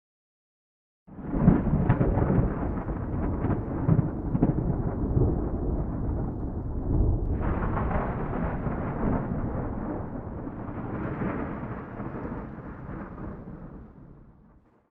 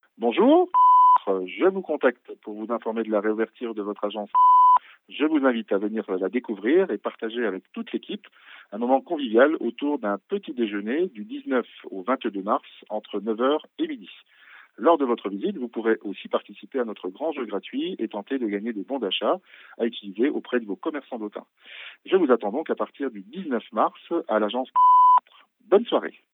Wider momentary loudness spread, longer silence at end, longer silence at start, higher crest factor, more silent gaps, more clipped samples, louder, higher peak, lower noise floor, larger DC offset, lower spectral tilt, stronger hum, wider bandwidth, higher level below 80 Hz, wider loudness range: about the same, 15 LU vs 15 LU; first, 0.6 s vs 0.25 s; first, 1.1 s vs 0.2 s; about the same, 22 dB vs 18 dB; neither; neither; second, -29 LUFS vs -24 LUFS; about the same, -6 dBFS vs -6 dBFS; about the same, -58 dBFS vs -56 dBFS; neither; first, -12.5 dB/octave vs -9 dB/octave; neither; second, 3.5 kHz vs 4 kHz; first, -34 dBFS vs -88 dBFS; about the same, 9 LU vs 7 LU